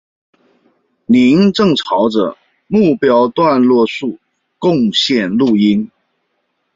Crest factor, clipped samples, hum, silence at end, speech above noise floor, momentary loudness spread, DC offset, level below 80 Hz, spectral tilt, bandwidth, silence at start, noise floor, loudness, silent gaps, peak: 12 dB; under 0.1%; none; 0.9 s; 55 dB; 8 LU; under 0.1%; -54 dBFS; -6 dB/octave; 7.6 kHz; 1.1 s; -67 dBFS; -13 LUFS; none; -2 dBFS